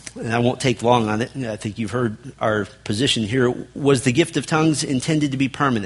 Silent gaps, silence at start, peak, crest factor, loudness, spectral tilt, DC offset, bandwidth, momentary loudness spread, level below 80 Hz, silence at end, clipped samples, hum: none; 0.05 s; -2 dBFS; 20 dB; -21 LUFS; -5 dB/octave; under 0.1%; 11.5 kHz; 8 LU; -50 dBFS; 0 s; under 0.1%; none